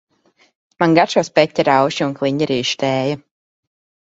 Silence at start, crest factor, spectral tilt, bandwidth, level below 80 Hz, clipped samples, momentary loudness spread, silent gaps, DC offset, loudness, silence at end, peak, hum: 0.8 s; 18 dB; -5 dB/octave; 8 kHz; -58 dBFS; under 0.1%; 6 LU; none; under 0.1%; -17 LUFS; 0.85 s; 0 dBFS; none